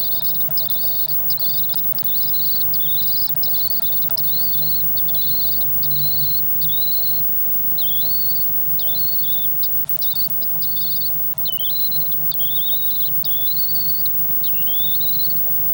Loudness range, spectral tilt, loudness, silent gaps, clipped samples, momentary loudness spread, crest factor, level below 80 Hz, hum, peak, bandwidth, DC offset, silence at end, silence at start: 1 LU; -4 dB/octave; -14 LUFS; none; under 0.1%; 2 LU; 10 dB; -52 dBFS; none; -8 dBFS; 18.5 kHz; under 0.1%; 0 s; 0 s